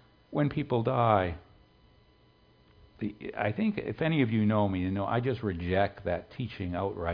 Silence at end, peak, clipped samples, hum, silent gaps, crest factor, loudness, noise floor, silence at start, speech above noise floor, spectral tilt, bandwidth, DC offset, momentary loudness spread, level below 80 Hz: 0 s; -10 dBFS; under 0.1%; none; none; 22 dB; -30 LUFS; -62 dBFS; 0.3 s; 33 dB; -10.5 dB/octave; 5.2 kHz; under 0.1%; 11 LU; -54 dBFS